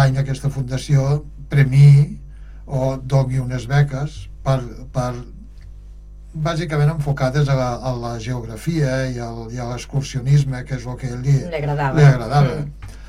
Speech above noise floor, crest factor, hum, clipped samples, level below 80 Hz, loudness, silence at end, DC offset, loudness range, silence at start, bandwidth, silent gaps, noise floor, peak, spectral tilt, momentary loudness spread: 20 dB; 16 dB; none; under 0.1%; -36 dBFS; -19 LUFS; 0 s; under 0.1%; 6 LU; 0 s; 11 kHz; none; -37 dBFS; -4 dBFS; -7.5 dB/octave; 14 LU